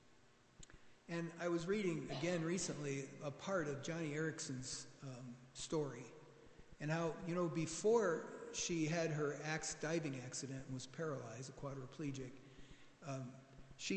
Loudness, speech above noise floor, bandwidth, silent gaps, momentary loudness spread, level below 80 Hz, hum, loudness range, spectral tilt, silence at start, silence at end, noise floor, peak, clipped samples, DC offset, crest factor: -43 LUFS; 27 dB; 9 kHz; none; 19 LU; -70 dBFS; none; 7 LU; -4.5 dB/octave; 0.1 s; 0 s; -70 dBFS; -24 dBFS; under 0.1%; under 0.1%; 20 dB